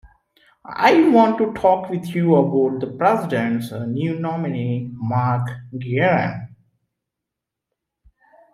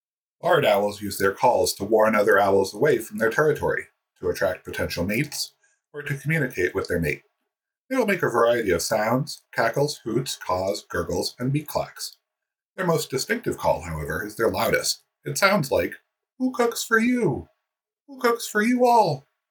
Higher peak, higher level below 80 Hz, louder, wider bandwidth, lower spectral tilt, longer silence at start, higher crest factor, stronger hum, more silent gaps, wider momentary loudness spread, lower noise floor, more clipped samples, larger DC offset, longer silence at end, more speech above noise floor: about the same, -2 dBFS vs -4 dBFS; second, -58 dBFS vs -52 dBFS; first, -19 LUFS vs -23 LUFS; second, 15 kHz vs 19 kHz; first, -8 dB/octave vs -4.5 dB/octave; first, 0.65 s vs 0.45 s; about the same, 18 dB vs 20 dB; neither; second, none vs 7.81-7.88 s, 12.62-12.74 s, 18.02-18.06 s; about the same, 11 LU vs 11 LU; about the same, -84 dBFS vs -87 dBFS; neither; neither; first, 2.05 s vs 0.3 s; about the same, 65 dB vs 64 dB